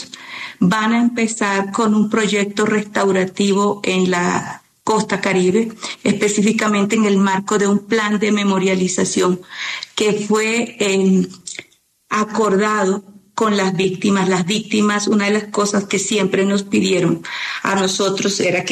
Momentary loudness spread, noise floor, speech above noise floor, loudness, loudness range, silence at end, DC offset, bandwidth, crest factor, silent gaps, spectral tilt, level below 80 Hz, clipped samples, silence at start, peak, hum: 7 LU; -52 dBFS; 35 dB; -17 LUFS; 2 LU; 0 s; under 0.1%; 13.5 kHz; 14 dB; none; -4.5 dB/octave; -60 dBFS; under 0.1%; 0 s; -4 dBFS; none